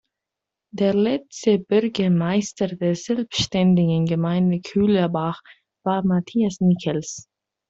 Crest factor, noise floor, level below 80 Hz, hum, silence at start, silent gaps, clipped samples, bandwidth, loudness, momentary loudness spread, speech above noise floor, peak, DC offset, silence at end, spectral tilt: 16 dB; -85 dBFS; -56 dBFS; none; 0.75 s; none; under 0.1%; 7.8 kHz; -21 LUFS; 8 LU; 65 dB; -6 dBFS; under 0.1%; 0.5 s; -6.5 dB/octave